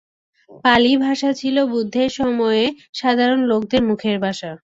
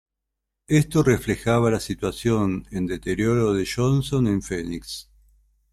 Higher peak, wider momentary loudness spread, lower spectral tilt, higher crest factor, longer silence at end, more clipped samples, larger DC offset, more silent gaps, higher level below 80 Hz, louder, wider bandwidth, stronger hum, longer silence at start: first, -2 dBFS vs -6 dBFS; about the same, 8 LU vs 9 LU; second, -5 dB/octave vs -6.5 dB/octave; about the same, 16 dB vs 18 dB; second, 0.2 s vs 0.7 s; neither; neither; first, 2.89-2.93 s vs none; second, -52 dBFS vs -44 dBFS; first, -18 LUFS vs -23 LUFS; second, 7.8 kHz vs 14 kHz; neither; second, 0.5 s vs 0.7 s